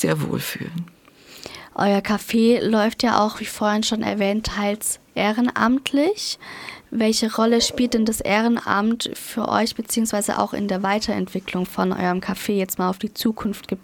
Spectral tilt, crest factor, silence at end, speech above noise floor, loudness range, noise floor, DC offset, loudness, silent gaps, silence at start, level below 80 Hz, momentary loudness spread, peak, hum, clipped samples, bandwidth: -4 dB/octave; 20 dB; 0.05 s; 24 dB; 3 LU; -45 dBFS; under 0.1%; -21 LUFS; none; 0 s; -50 dBFS; 9 LU; 0 dBFS; none; under 0.1%; 18 kHz